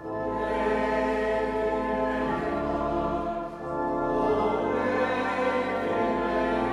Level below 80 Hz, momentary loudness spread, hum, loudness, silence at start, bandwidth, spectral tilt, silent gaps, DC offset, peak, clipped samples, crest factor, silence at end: -46 dBFS; 4 LU; none; -27 LUFS; 0 s; 11.5 kHz; -6.5 dB/octave; none; under 0.1%; -14 dBFS; under 0.1%; 12 dB; 0 s